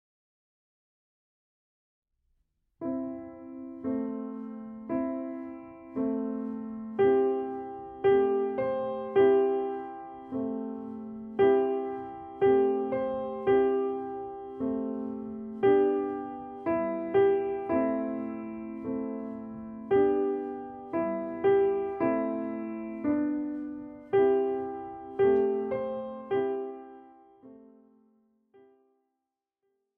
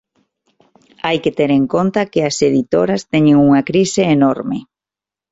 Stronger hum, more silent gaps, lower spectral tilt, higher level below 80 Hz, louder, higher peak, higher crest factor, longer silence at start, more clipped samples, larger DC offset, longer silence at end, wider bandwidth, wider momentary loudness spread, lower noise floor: neither; neither; first, -10 dB/octave vs -6 dB/octave; second, -66 dBFS vs -52 dBFS; second, -29 LUFS vs -14 LUFS; second, -14 dBFS vs -2 dBFS; about the same, 16 dB vs 14 dB; first, 2.8 s vs 1.05 s; neither; neither; first, 2.35 s vs 0.7 s; second, 3.4 kHz vs 8 kHz; first, 16 LU vs 9 LU; about the same, -86 dBFS vs -88 dBFS